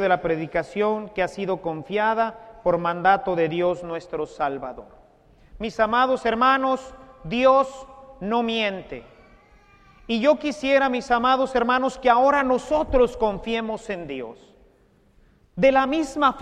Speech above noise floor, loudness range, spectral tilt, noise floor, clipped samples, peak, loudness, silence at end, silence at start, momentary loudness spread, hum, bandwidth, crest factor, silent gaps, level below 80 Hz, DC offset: 37 dB; 5 LU; -5.5 dB/octave; -58 dBFS; under 0.1%; -4 dBFS; -22 LUFS; 0 s; 0 s; 15 LU; none; 10 kHz; 20 dB; none; -46 dBFS; under 0.1%